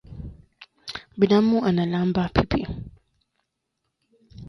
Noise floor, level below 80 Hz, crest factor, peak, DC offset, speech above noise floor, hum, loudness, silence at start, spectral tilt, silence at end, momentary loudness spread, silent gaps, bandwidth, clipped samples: -78 dBFS; -42 dBFS; 24 dB; 0 dBFS; under 0.1%; 58 dB; none; -22 LUFS; 0.1 s; -8 dB/octave; 0 s; 22 LU; none; 11 kHz; under 0.1%